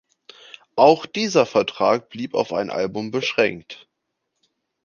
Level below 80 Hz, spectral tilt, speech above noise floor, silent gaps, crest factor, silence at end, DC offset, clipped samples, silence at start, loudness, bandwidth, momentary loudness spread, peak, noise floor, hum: -64 dBFS; -4.5 dB/octave; 57 dB; none; 20 dB; 1.1 s; under 0.1%; under 0.1%; 0.75 s; -20 LUFS; 7.2 kHz; 19 LU; -2 dBFS; -77 dBFS; none